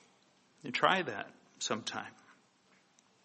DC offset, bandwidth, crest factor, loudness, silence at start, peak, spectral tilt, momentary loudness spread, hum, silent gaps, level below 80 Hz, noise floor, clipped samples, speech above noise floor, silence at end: under 0.1%; 8.4 kHz; 26 dB; -34 LUFS; 0.65 s; -12 dBFS; -2.5 dB/octave; 20 LU; none; none; -82 dBFS; -69 dBFS; under 0.1%; 34 dB; 1.15 s